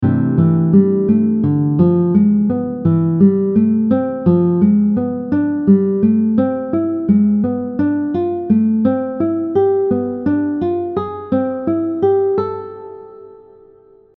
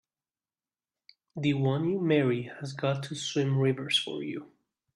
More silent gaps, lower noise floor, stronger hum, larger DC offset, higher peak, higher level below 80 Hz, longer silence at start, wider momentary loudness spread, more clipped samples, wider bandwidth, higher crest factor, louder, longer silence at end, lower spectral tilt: neither; second, -47 dBFS vs under -90 dBFS; neither; neither; first, 0 dBFS vs -14 dBFS; first, -52 dBFS vs -70 dBFS; second, 0 s vs 1.35 s; second, 6 LU vs 12 LU; neither; second, 4 kHz vs 11 kHz; about the same, 14 dB vs 18 dB; first, -15 LUFS vs -29 LUFS; first, 0.8 s vs 0.5 s; first, -13 dB/octave vs -5.5 dB/octave